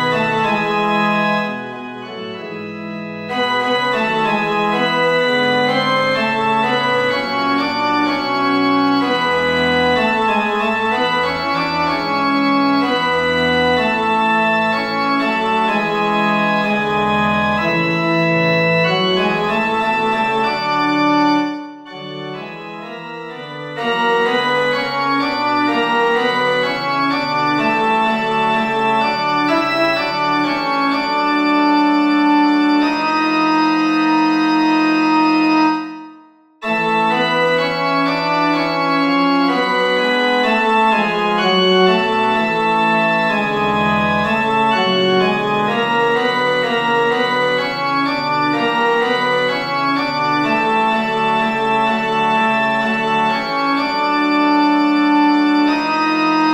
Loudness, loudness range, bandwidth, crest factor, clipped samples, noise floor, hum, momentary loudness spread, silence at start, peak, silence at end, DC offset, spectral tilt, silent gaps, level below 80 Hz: -15 LUFS; 3 LU; 16 kHz; 14 dB; under 0.1%; -45 dBFS; none; 4 LU; 0 s; -2 dBFS; 0 s; under 0.1%; -5.5 dB/octave; none; -52 dBFS